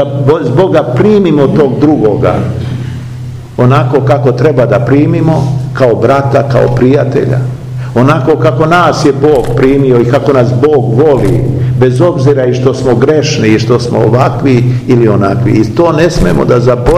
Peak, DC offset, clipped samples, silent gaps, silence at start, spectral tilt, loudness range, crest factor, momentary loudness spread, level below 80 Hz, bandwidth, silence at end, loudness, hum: 0 dBFS; 0.8%; 5%; none; 0 s; -7.5 dB/octave; 2 LU; 8 dB; 4 LU; -28 dBFS; 10.5 kHz; 0 s; -8 LUFS; none